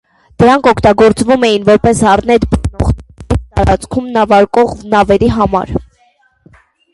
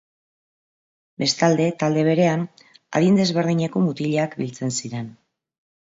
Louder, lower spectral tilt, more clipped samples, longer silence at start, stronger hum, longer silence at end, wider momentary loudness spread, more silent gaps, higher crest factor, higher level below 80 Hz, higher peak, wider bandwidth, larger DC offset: first, -11 LUFS vs -21 LUFS; about the same, -6 dB/octave vs -5.5 dB/octave; neither; second, 0.4 s vs 1.2 s; neither; first, 1.1 s vs 0.85 s; about the same, 8 LU vs 9 LU; neither; second, 10 dB vs 18 dB; first, -24 dBFS vs -64 dBFS; first, 0 dBFS vs -4 dBFS; first, 11.5 kHz vs 8 kHz; neither